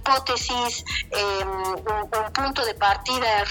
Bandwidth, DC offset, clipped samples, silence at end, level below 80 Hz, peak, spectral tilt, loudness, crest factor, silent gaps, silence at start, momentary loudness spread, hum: 18 kHz; under 0.1%; under 0.1%; 0 s; -42 dBFS; -4 dBFS; -2.5 dB/octave; -24 LUFS; 20 dB; none; 0 s; 6 LU; none